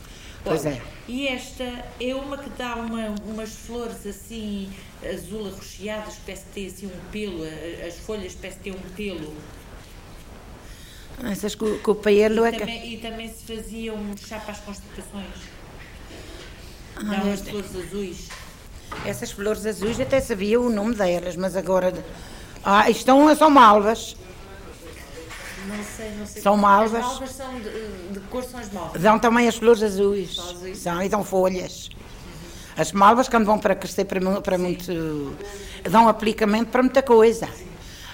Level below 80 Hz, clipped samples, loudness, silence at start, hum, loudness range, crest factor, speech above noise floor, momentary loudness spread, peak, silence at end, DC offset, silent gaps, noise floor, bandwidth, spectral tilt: -44 dBFS; under 0.1%; -22 LUFS; 0 s; none; 16 LU; 18 dB; 19 dB; 23 LU; -4 dBFS; 0 s; under 0.1%; none; -42 dBFS; 16.5 kHz; -5 dB/octave